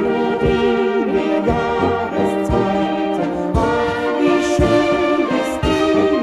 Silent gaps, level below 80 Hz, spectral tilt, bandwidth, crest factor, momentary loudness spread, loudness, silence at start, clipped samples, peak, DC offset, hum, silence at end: none; -32 dBFS; -6.5 dB/octave; 13 kHz; 12 dB; 4 LU; -17 LUFS; 0 s; under 0.1%; -4 dBFS; under 0.1%; none; 0 s